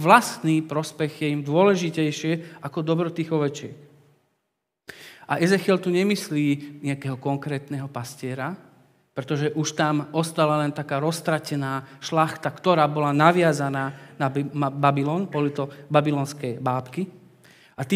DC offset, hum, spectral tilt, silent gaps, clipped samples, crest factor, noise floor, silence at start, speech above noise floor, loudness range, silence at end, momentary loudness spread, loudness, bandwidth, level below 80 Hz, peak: under 0.1%; none; -6 dB/octave; none; under 0.1%; 24 dB; -79 dBFS; 0 s; 56 dB; 6 LU; 0 s; 13 LU; -24 LUFS; 16 kHz; -76 dBFS; 0 dBFS